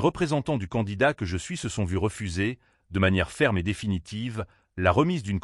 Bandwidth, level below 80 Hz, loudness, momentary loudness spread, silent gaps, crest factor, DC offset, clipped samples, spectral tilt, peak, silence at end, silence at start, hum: 12 kHz; -46 dBFS; -27 LUFS; 9 LU; none; 18 dB; under 0.1%; under 0.1%; -6 dB/octave; -8 dBFS; 0 s; 0 s; none